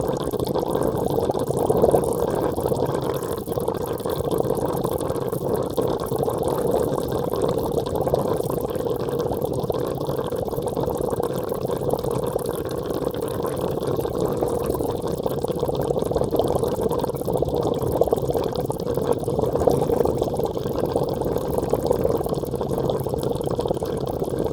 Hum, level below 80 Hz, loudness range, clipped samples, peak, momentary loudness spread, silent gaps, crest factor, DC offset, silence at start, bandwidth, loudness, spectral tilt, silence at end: none; -42 dBFS; 3 LU; under 0.1%; -2 dBFS; 4 LU; none; 22 dB; under 0.1%; 0 s; over 20 kHz; -24 LUFS; -7 dB/octave; 0 s